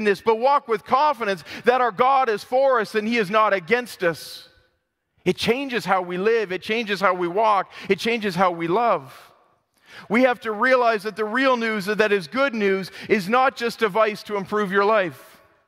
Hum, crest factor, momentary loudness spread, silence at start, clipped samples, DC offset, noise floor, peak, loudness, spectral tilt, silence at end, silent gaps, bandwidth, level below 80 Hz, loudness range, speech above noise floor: none; 20 dB; 6 LU; 0 s; under 0.1%; under 0.1%; -72 dBFS; -2 dBFS; -21 LUFS; -5 dB/octave; 0.45 s; none; 16 kHz; -66 dBFS; 3 LU; 51 dB